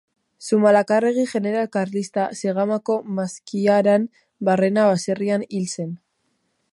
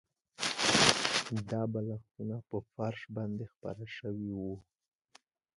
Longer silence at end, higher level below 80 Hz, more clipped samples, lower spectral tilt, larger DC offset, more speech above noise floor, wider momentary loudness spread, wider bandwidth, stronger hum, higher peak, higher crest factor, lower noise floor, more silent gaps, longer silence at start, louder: second, 0.75 s vs 0.95 s; second, -70 dBFS vs -64 dBFS; neither; first, -6 dB/octave vs -3 dB/octave; neither; first, 50 dB vs 28 dB; second, 11 LU vs 17 LU; about the same, 11.5 kHz vs 11.5 kHz; neither; about the same, -4 dBFS vs -2 dBFS; second, 18 dB vs 32 dB; first, -70 dBFS vs -66 dBFS; second, none vs 3.57-3.61 s; about the same, 0.4 s vs 0.4 s; first, -21 LUFS vs -33 LUFS